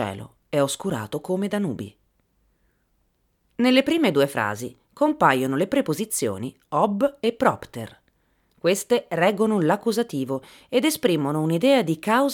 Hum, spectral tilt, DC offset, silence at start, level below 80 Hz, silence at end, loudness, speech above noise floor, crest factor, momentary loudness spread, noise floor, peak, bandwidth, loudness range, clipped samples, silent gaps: none; -5 dB/octave; under 0.1%; 0 s; -64 dBFS; 0 s; -23 LUFS; 46 dB; 20 dB; 14 LU; -68 dBFS; -4 dBFS; 18.5 kHz; 4 LU; under 0.1%; none